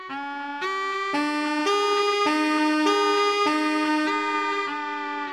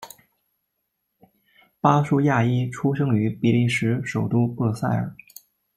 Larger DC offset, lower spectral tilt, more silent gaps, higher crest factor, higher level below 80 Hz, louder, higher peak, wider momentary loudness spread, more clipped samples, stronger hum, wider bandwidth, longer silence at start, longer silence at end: neither; second, -2 dB/octave vs -7.5 dB/octave; neither; second, 14 dB vs 20 dB; second, -74 dBFS vs -60 dBFS; about the same, -23 LUFS vs -22 LUFS; second, -10 dBFS vs -4 dBFS; about the same, 8 LU vs 6 LU; neither; neither; second, 13 kHz vs 15.5 kHz; about the same, 0 s vs 0 s; second, 0 s vs 0.65 s